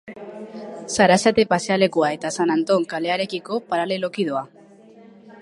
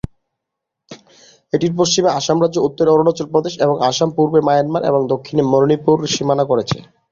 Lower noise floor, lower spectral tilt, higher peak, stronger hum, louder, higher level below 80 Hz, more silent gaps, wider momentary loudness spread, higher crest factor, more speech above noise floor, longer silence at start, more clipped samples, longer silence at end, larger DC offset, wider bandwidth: second, -47 dBFS vs -80 dBFS; about the same, -4.5 dB/octave vs -5 dB/octave; about the same, -2 dBFS vs -2 dBFS; neither; second, -20 LUFS vs -16 LUFS; second, -60 dBFS vs -50 dBFS; neither; first, 19 LU vs 5 LU; first, 20 dB vs 14 dB; second, 26 dB vs 65 dB; second, 0.05 s vs 0.9 s; neither; second, 0 s vs 0.3 s; neither; first, 11.5 kHz vs 7.6 kHz